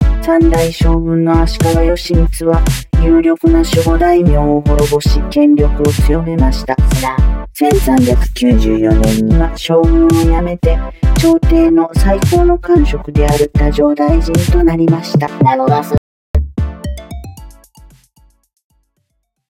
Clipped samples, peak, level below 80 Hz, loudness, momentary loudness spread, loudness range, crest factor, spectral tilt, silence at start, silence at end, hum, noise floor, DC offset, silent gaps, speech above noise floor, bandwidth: under 0.1%; 0 dBFS; -16 dBFS; -12 LUFS; 6 LU; 4 LU; 10 dB; -7 dB/octave; 0 s; 2 s; none; -66 dBFS; under 0.1%; 15.98-16.34 s; 56 dB; 16.5 kHz